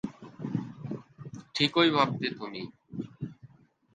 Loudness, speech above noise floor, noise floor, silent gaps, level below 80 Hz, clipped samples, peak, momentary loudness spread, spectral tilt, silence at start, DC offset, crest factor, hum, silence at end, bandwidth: -29 LUFS; 30 dB; -57 dBFS; none; -68 dBFS; under 0.1%; -10 dBFS; 19 LU; -5.5 dB/octave; 0.05 s; under 0.1%; 22 dB; none; 0.5 s; 9.2 kHz